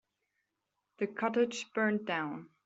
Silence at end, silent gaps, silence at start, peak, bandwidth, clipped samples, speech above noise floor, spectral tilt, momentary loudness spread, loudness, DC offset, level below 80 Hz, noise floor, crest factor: 0.2 s; none; 1 s; -16 dBFS; 8 kHz; under 0.1%; 51 dB; -3.5 dB/octave; 8 LU; -34 LUFS; under 0.1%; -82 dBFS; -85 dBFS; 20 dB